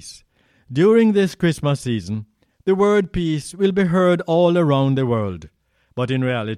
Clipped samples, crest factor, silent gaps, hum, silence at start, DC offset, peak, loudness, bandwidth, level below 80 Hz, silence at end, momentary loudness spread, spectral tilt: under 0.1%; 14 dB; none; none; 0.05 s; under 0.1%; -4 dBFS; -18 LUFS; 13.5 kHz; -46 dBFS; 0 s; 13 LU; -7 dB/octave